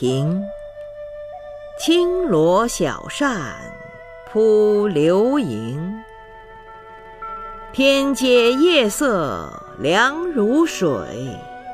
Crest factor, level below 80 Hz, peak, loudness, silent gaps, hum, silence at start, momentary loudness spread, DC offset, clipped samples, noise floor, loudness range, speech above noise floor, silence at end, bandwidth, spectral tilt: 16 dB; -46 dBFS; -2 dBFS; -18 LUFS; none; none; 0 s; 20 LU; under 0.1%; under 0.1%; -40 dBFS; 4 LU; 23 dB; 0 s; 15.5 kHz; -5 dB/octave